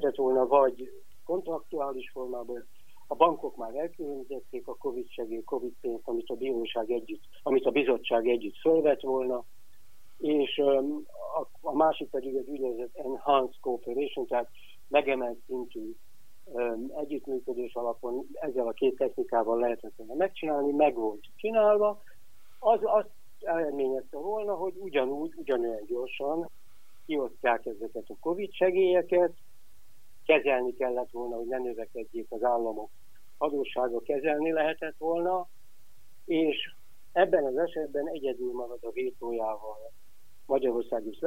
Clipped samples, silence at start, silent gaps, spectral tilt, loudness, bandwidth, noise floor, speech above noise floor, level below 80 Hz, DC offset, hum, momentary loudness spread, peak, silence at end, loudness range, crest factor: under 0.1%; 0 s; none; -6 dB/octave; -30 LUFS; 16 kHz; -65 dBFS; 35 dB; -70 dBFS; 0.8%; none; 13 LU; -6 dBFS; 0 s; 5 LU; 24 dB